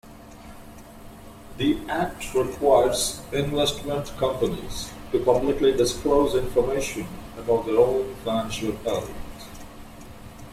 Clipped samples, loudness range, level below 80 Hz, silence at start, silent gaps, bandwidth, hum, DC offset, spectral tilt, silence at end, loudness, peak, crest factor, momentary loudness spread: under 0.1%; 3 LU; -42 dBFS; 0.05 s; none; 16 kHz; none; under 0.1%; -4.5 dB/octave; 0 s; -24 LUFS; -6 dBFS; 20 dB; 23 LU